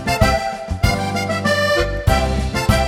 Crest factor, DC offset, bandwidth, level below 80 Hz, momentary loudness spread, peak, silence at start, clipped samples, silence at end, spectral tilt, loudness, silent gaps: 18 dB; under 0.1%; 16.5 kHz; -24 dBFS; 4 LU; 0 dBFS; 0 s; under 0.1%; 0 s; -5 dB/octave; -18 LUFS; none